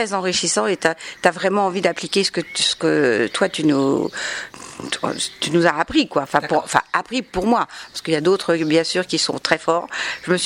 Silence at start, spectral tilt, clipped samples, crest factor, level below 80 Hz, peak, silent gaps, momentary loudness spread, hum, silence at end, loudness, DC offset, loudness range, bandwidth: 0 s; -3.5 dB/octave; under 0.1%; 20 dB; -52 dBFS; 0 dBFS; none; 7 LU; none; 0 s; -19 LUFS; under 0.1%; 2 LU; 16 kHz